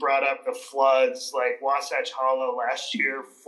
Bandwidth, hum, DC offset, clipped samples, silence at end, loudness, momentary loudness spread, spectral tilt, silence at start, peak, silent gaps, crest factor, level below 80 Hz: 12.5 kHz; none; under 0.1%; under 0.1%; 0.2 s; -25 LUFS; 7 LU; -1.5 dB/octave; 0 s; -8 dBFS; none; 16 dB; under -90 dBFS